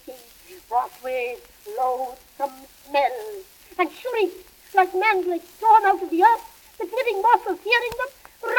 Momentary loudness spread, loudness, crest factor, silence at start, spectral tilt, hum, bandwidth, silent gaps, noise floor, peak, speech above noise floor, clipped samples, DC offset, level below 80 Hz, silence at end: 16 LU; -22 LUFS; 20 dB; 0.05 s; -3 dB/octave; none; 18 kHz; none; -47 dBFS; -4 dBFS; 25 dB; under 0.1%; under 0.1%; -62 dBFS; 0 s